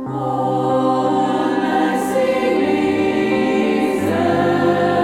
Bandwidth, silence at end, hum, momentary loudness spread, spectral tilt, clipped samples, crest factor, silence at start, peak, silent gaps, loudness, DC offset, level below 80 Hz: 16 kHz; 0 s; none; 2 LU; -6.5 dB/octave; under 0.1%; 12 dB; 0 s; -4 dBFS; none; -17 LUFS; under 0.1%; -54 dBFS